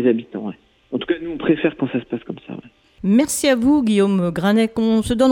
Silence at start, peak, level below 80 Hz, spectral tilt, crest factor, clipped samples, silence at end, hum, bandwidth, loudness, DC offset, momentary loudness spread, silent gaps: 0 s; -4 dBFS; -46 dBFS; -5.5 dB/octave; 14 dB; under 0.1%; 0 s; none; 17 kHz; -19 LUFS; under 0.1%; 15 LU; none